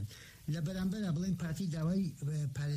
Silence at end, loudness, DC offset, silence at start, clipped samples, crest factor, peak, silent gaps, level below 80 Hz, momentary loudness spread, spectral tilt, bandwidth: 0 s; -37 LUFS; under 0.1%; 0 s; under 0.1%; 10 dB; -24 dBFS; none; -58 dBFS; 6 LU; -7 dB/octave; 15 kHz